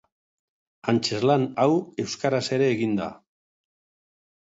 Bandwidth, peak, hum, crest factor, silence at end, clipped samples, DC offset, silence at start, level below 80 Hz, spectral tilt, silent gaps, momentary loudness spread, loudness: 8 kHz; -6 dBFS; none; 20 dB; 1.4 s; under 0.1%; under 0.1%; 0.85 s; -66 dBFS; -5.5 dB/octave; none; 8 LU; -24 LUFS